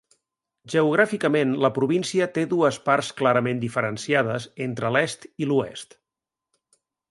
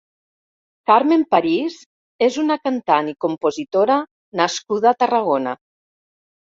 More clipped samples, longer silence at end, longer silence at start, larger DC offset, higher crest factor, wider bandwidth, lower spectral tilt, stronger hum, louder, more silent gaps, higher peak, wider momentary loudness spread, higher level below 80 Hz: neither; first, 1.25 s vs 0.95 s; second, 0.65 s vs 0.9 s; neither; about the same, 20 dB vs 18 dB; first, 11.5 kHz vs 7.8 kHz; about the same, -5.5 dB/octave vs -4.5 dB/octave; neither; second, -23 LUFS vs -19 LUFS; second, none vs 1.86-2.19 s, 4.11-4.32 s; about the same, -4 dBFS vs -2 dBFS; about the same, 8 LU vs 9 LU; about the same, -66 dBFS vs -68 dBFS